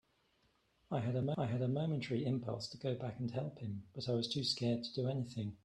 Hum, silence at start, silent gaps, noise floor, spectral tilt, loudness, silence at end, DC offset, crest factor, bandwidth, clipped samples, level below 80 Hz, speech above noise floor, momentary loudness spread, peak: none; 0.9 s; none; -76 dBFS; -6.5 dB/octave; -39 LUFS; 0.1 s; under 0.1%; 16 dB; 11.5 kHz; under 0.1%; -72 dBFS; 37 dB; 7 LU; -22 dBFS